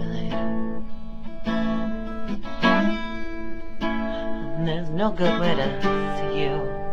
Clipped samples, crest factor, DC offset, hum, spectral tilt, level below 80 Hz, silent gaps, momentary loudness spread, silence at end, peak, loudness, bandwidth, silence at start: under 0.1%; 18 dB; under 0.1%; none; -7 dB/octave; -36 dBFS; none; 12 LU; 0 s; -4 dBFS; -26 LUFS; 7.2 kHz; 0 s